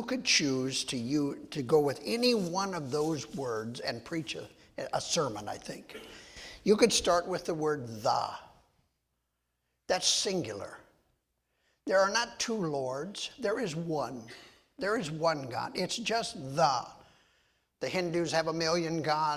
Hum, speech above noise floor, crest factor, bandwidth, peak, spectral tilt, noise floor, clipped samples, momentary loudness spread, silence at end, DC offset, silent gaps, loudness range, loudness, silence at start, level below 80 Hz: none; 50 dB; 22 dB; 16 kHz; -10 dBFS; -3.5 dB/octave; -81 dBFS; under 0.1%; 16 LU; 0 s; under 0.1%; none; 4 LU; -31 LUFS; 0 s; -64 dBFS